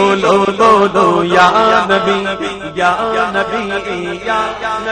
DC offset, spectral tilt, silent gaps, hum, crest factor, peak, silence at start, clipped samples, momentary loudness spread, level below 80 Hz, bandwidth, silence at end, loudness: under 0.1%; -4.5 dB/octave; none; none; 12 dB; 0 dBFS; 0 s; under 0.1%; 10 LU; -44 dBFS; 9.8 kHz; 0 s; -13 LUFS